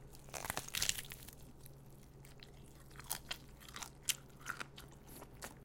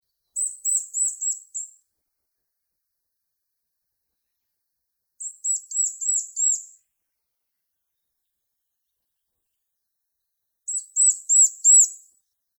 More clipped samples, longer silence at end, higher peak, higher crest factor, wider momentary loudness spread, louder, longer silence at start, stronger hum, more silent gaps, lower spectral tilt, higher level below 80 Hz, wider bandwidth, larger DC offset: neither; second, 0 s vs 0.6 s; second, -12 dBFS vs -6 dBFS; first, 36 dB vs 20 dB; about the same, 21 LU vs 20 LU; second, -43 LUFS vs -19 LUFS; second, 0 s vs 0.35 s; neither; neither; first, -1 dB/octave vs 7.5 dB/octave; first, -60 dBFS vs under -90 dBFS; second, 17 kHz vs over 20 kHz; neither